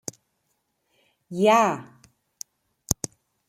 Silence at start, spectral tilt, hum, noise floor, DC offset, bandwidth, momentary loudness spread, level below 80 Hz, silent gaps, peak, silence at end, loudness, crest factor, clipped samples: 1.3 s; -4 dB/octave; none; -74 dBFS; under 0.1%; 16.5 kHz; 23 LU; -54 dBFS; none; 0 dBFS; 0.55 s; -23 LUFS; 26 dB; under 0.1%